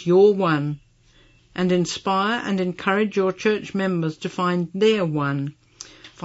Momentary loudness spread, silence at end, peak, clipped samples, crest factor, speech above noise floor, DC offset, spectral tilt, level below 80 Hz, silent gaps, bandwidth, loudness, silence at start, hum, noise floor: 16 LU; 0 s; -6 dBFS; under 0.1%; 16 dB; 34 dB; under 0.1%; -6 dB/octave; -60 dBFS; none; 8 kHz; -22 LUFS; 0 s; none; -55 dBFS